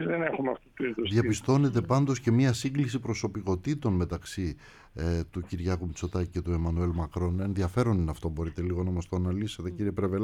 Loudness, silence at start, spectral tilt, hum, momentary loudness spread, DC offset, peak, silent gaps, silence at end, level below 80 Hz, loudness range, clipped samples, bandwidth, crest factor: -30 LUFS; 0 s; -7 dB/octave; none; 9 LU; under 0.1%; -12 dBFS; none; 0 s; -44 dBFS; 5 LU; under 0.1%; 13.5 kHz; 18 dB